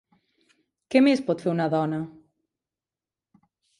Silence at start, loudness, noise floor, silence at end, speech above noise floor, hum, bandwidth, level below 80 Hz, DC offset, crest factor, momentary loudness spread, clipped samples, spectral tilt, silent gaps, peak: 0.9 s; -24 LUFS; under -90 dBFS; 1.7 s; over 68 dB; none; 11 kHz; -72 dBFS; under 0.1%; 20 dB; 12 LU; under 0.1%; -7 dB/octave; none; -6 dBFS